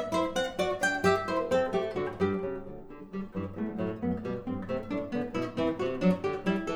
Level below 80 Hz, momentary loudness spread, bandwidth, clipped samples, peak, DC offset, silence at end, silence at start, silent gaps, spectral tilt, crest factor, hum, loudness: -54 dBFS; 10 LU; 15.5 kHz; under 0.1%; -12 dBFS; under 0.1%; 0 s; 0 s; none; -6 dB/octave; 20 dB; none; -31 LUFS